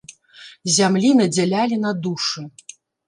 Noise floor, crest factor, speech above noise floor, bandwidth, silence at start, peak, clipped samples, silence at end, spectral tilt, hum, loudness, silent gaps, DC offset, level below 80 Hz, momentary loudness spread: -45 dBFS; 16 dB; 27 dB; 11.5 kHz; 0.1 s; -4 dBFS; under 0.1%; 0.6 s; -4 dB/octave; none; -19 LUFS; none; under 0.1%; -68 dBFS; 14 LU